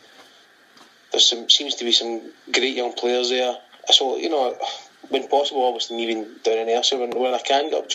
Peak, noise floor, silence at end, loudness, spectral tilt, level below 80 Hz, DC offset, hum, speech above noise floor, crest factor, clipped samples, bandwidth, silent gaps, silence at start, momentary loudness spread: 0 dBFS; -52 dBFS; 0 s; -20 LUFS; 0 dB/octave; -82 dBFS; under 0.1%; none; 31 dB; 22 dB; under 0.1%; 14 kHz; none; 0.2 s; 11 LU